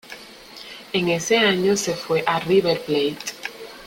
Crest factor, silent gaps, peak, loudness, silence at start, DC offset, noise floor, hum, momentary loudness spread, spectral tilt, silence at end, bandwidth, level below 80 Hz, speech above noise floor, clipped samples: 20 dB; none; -2 dBFS; -21 LUFS; 0.05 s; under 0.1%; -41 dBFS; none; 20 LU; -4 dB/octave; 0 s; 17 kHz; -58 dBFS; 21 dB; under 0.1%